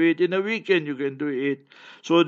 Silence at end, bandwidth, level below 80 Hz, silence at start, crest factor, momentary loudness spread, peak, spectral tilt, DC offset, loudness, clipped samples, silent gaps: 0 s; 7.2 kHz; -80 dBFS; 0 s; 16 dB; 9 LU; -6 dBFS; -6 dB/octave; under 0.1%; -24 LUFS; under 0.1%; none